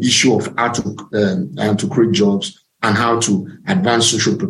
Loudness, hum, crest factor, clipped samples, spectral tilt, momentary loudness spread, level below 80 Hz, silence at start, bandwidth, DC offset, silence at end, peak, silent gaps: -16 LUFS; none; 14 dB; under 0.1%; -4 dB/octave; 8 LU; -54 dBFS; 0 s; 12 kHz; under 0.1%; 0 s; -2 dBFS; none